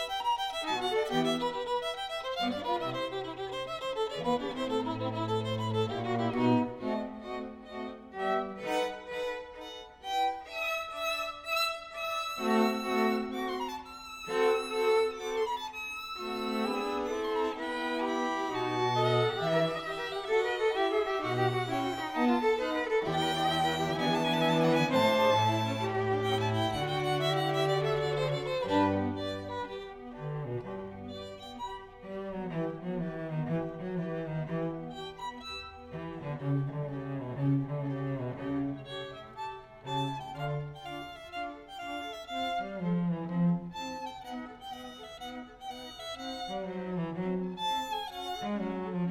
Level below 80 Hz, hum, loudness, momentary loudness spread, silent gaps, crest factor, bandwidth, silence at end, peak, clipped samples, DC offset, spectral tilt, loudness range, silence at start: -60 dBFS; none; -32 LUFS; 14 LU; none; 18 dB; 18 kHz; 0 s; -14 dBFS; under 0.1%; under 0.1%; -5.5 dB/octave; 9 LU; 0 s